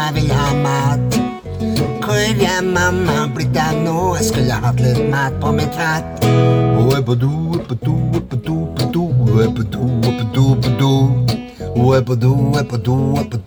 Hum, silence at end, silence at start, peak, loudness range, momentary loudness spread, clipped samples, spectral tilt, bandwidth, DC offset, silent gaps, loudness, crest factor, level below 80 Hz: none; 0 s; 0 s; -2 dBFS; 1 LU; 6 LU; under 0.1%; -6.5 dB/octave; over 20 kHz; under 0.1%; none; -16 LUFS; 14 dB; -34 dBFS